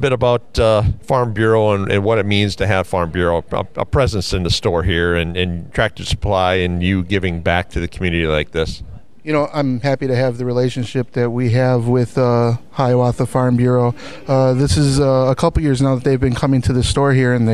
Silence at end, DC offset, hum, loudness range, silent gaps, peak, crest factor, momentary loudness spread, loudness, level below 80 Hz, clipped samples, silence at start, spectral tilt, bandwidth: 0 s; 2%; none; 4 LU; none; 0 dBFS; 14 dB; 6 LU; -17 LUFS; -30 dBFS; under 0.1%; 0 s; -6.5 dB/octave; 12.5 kHz